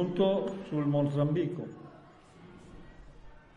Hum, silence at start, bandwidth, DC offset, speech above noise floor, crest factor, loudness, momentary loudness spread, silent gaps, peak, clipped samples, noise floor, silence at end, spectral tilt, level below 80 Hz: none; 0 s; 7.4 kHz; under 0.1%; 25 dB; 18 dB; -30 LUFS; 24 LU; none; -16 dBFS; under 0.1%; -55 dBFS; 0.2 s; -9 dB/octave; -60 dBFS